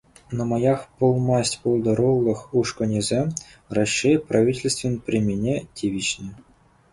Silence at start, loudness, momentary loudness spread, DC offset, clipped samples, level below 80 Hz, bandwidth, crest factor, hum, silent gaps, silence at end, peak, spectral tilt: 0.3 s; -22 LUFS; 8 LU; under 0.1%; under 0.1%; -50 dBFS; 11.5 kHz; 16 dB; none; none; 0.55 s; -6 dBFS; -5.5 dB/octave